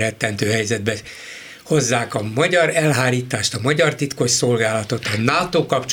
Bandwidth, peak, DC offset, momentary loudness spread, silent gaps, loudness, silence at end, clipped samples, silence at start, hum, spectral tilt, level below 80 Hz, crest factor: over 20 kHz; 0 dBFS; under 0.1%; 8 LU; none; -19 LUFS; 0 s; under 0.1%; 0 s; none; -4 dB/octave; -54 dBFS; 18 dB